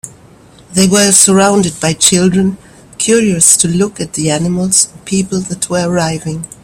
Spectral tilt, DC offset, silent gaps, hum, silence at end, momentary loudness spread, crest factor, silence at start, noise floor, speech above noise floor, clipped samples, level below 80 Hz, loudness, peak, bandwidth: -3.5 dB/octave; under 0.1%; none; none; 0.15 s; 11 LU; 12 dB; 0.05 s; -40 dBFS; 29 dB; 0.3%; -44 dBFS; -10 LUFS; 0 dBFS; over 20 kHz